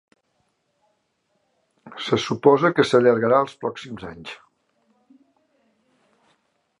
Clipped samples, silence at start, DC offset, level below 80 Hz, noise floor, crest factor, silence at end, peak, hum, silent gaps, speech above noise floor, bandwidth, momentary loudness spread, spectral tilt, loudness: under 0.1%; 1.85 s; under 0.1%; -62 dBFS; -71 dBFS; 22 dB; 2.45 s; -2 dBFS; none; none; 51 dB; 11 kHz; 21 LU; -6 dB/octave; -19 LUFS